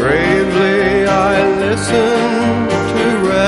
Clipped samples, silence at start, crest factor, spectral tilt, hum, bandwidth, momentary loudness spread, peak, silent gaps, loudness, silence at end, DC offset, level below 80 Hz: under 0.1%; 0 s; 12 dB; -5.5 dB/octave; none; 11.5 kHz; 3 LU; 0 dBFS; none; -13 LUFS; 0 s; under 0.1%; -36 dBFS